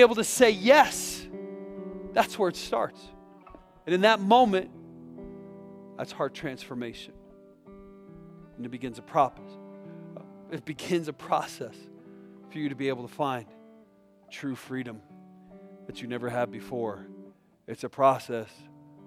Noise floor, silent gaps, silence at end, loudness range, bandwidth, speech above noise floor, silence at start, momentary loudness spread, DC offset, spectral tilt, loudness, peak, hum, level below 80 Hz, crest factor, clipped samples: -58 dBFS; none; 0.6 s; 12 LU; 16 kHz; 32 dB; 0 s; 26 LU; under 0.1%; -4 dB/octave; -27 LUFS; -6 dBFS; none; -62 dBFS; 22 dB; under 0.1%